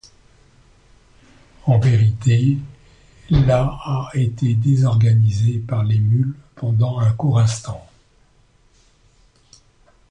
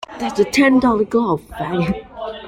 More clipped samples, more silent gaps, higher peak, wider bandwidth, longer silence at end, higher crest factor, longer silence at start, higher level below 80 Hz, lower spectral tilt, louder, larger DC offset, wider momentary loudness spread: neither; neither; about the same, -4 dBFS vs -2 dBFS; second, 9.6 kHz vs 16 kHz; first, 2.3 s vs 0 s; about the same, 16 dB vs 16 dB; first, 1.65 s vs 0 s; first, -38 dBFS vs -44 dBFS; first, -7.5 dB/octave vs -5.5 dB/octave; about the same, -18 LUFS vs -17 LUFS; neither; about the same, 10 LU vs 11 LU